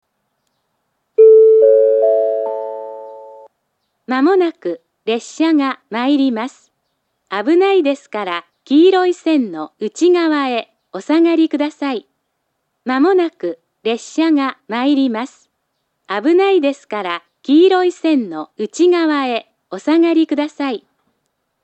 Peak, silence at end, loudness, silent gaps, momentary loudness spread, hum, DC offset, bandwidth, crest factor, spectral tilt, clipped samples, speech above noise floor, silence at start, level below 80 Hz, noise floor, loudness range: 0 dBFS; 0.85 s; -15 LUFS; none; 15 LU; none; under 0.1%; 8.4 kHz; 16 dB; -4.5 dB/octave; under 0.1%; 56 dB; 1.2 s; -82 dBFS; -71 dBFS; 5 LU